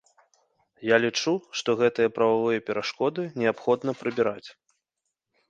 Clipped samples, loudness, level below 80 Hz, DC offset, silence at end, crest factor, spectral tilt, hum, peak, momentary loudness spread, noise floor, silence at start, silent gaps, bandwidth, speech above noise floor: under 0.1%; -25 LUFS; -70 dBFS; under 0.1%; 1 s; 20 dB; -4.5 dB/octave; none; -6 dBFS; 6 LU; -83 dBFS; 0.8 s; none; 7.6 kHz; 58 dB